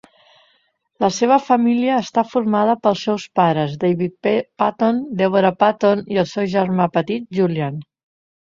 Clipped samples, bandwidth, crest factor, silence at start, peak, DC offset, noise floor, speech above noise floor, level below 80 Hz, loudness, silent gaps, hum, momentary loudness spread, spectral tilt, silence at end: under 0.1%; 7.6 kHz; 16 dB; 1 s; -2 dBFS; under 0.1%; -63 dBFS; 46 dB; -60 dBFS; -18 LUFS; none; none; 6 LU; -6.5 dB/octave; 0.65 s